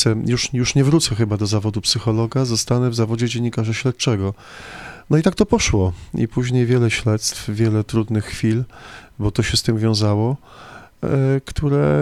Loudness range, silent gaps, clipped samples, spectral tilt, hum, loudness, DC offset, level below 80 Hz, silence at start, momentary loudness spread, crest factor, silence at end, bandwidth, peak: 2 LU; none; under 0.1%; -5.5 dB/octave; none; -19 LUFS; under 0.1%; -38 dBFS; 0 s; 8 LU; 16 dB; 0 s; 14 kHz; -2 dBFS